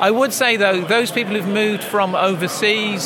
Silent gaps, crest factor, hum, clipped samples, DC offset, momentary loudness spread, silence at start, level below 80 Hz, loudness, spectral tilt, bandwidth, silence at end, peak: none; 16 dB; none; under 0.1%; under 0.1%; 4 LU; 0 s; -76 dBFS; -17 LUFS; -3.5 dB/octave; 17.5 kHz; 0 s; -2 dBFS